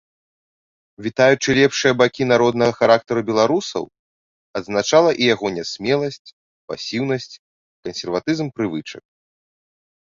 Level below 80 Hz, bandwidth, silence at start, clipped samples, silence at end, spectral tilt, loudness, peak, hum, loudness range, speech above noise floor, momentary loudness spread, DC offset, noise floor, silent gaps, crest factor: -56 dBFS; 7.6 kHz; 1 s; under 0.1%; 1.1 s; -4.5 dB/octave; -18 LUFS; -2 dBFS; none; 9 LU; over 72 dB; 15 LU; under 0.1%; under -90 dBFS; 3.99-4.54 s, 6.19-6.25 s, 6.33-6.68 s, 7.39-7.83 s; 18 dB